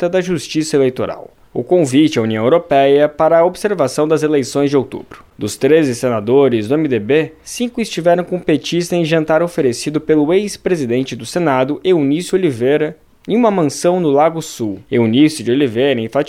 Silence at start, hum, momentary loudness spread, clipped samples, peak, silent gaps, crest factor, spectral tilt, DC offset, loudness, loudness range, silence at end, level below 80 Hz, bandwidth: 0 s; none; 10 LU; under 0.1%; 0 dBFS; none; 14 dB; -5.5 dB/octave; 0.1%; -15 LUFS; 2 LU; 0 s; -52 dBFS; 15 kHz